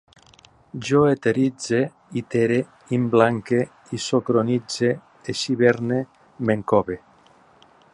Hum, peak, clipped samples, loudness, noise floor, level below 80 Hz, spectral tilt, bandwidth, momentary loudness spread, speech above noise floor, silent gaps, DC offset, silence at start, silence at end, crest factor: none; -2 dBFS; under 0.1%; -22 LUFS; -54 dBFS; -58 dBFS; -6 dB/octave; 11.5 kHz; 12 LU; 33 dB; none; under 0.1%; 0.75 s; 0.95 s; 20 dB